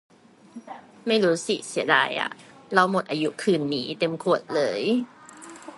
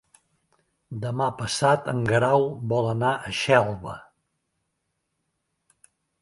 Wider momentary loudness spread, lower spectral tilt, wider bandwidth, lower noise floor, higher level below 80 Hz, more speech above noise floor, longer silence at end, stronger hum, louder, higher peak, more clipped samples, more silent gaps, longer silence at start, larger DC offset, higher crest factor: first, 21 LU vs 14 LU; about the same, -4.5 dB/octave vs -5 dB/octave; about the same, 11.5 kHz vs 11.5 kHz; second, -46 dBFS vs -78 dBFS; second, -74 dBFS vs -58 dBFS; second, 22 dB vs 54 dB; second, 0 s vs 2.2 s; neither; about the same, -24 LUFS vs -23 LUFS; about the same, -2 dBFS vs -4 dBFS; neither; neither; second, 0.55 s vs 0.9 s; neither; about the same, 22 dB vs 22 dB